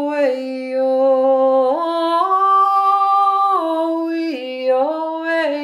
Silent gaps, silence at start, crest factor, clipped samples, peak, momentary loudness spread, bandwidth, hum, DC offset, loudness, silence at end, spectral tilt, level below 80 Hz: none; 0 s; 12 dB; under 0.1%; -4 dBFS; 8 LU; 11.5 kHz; none; under 0.1%; -16 LUFS; 0 s; -3.5 dB/octave; -76 dBFS